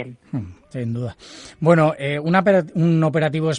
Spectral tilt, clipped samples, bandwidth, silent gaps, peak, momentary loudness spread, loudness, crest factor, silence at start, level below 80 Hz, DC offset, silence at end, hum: -7.5 dB/octave; under 0.1%; 9.8 kHz; none; -2 dBFS; 15 LU; -19 LUFS; 16 dB; 0 s; -58 dBFS; under 0.1%; 0 s; none